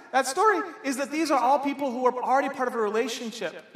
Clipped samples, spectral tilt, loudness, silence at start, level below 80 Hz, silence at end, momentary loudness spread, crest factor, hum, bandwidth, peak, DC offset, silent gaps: under 0.1%; -3 dB/octave; -26 LUFS; 0 s; -84 dBFS; 0.15 s; 8 LU; 16 dB; none; 15.5 kHz; -10 dBFS; under 0.1%; none